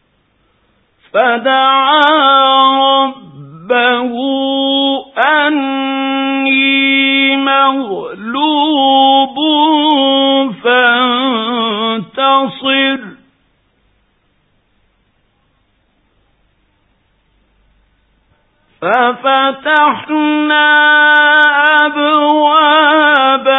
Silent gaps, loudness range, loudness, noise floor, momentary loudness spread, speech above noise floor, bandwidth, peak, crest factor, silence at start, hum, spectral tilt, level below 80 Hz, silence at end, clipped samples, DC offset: none; 8 LU; -10 LUFS; -58 dBFS; 8 LU; 47 dB; 4 kHz; 0 dBFS; 12 dB; 1.15 s; none; -5.5 dB/octave; -62 dBFS; 0 s; under 0.1%; under 0.1%